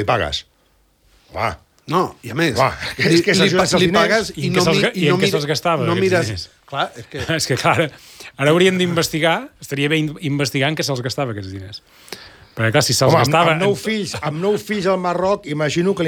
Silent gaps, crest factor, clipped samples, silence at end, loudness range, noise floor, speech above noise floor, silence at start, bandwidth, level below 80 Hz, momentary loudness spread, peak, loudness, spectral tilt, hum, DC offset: none; 16 dB; under 0.1%; 0 s; 5 LU; -58 dBFS; 41 dB; 0 s; over 20 kHz; -50 dBFS; 15 LU; -4 dBFS; -17 LUFS; -4.5 dB/octave; none; under 0.1%